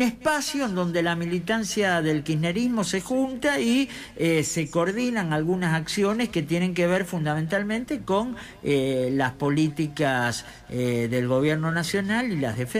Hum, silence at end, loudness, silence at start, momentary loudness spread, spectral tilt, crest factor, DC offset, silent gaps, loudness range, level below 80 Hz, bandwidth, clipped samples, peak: none; 0 s; -25 LUFS; 0 s; 4 LU; -5 dB/octave; 12 dB; under 0.1%; none; 1 LU; -54 dBFS; 15.5 kHz; under 0.1%; -12 dBFS